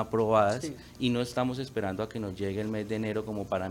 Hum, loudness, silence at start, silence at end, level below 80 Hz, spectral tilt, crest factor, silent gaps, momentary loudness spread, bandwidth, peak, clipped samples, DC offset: none; -31 LUFS; 0 s; 0 s; -58 dBFS; -6 dB/octave; 20 dB; none; 9 LU; 17 kHz; -10 dBFS; under 0.1%; under 0.1%